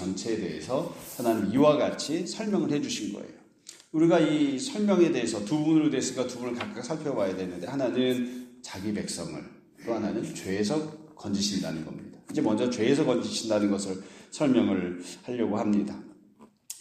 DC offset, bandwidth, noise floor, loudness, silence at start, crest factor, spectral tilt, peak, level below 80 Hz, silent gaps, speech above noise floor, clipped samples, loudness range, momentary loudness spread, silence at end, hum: under 0.1%; 15.5 kHz; -57 dBFS; -28 LUFS; 0 s; 20 dB; -5 dB/octave; -8 dBFS; -66 dBFS; none; 29 dB; under 0.1%; 6 LU; 16 LU; 0 s; none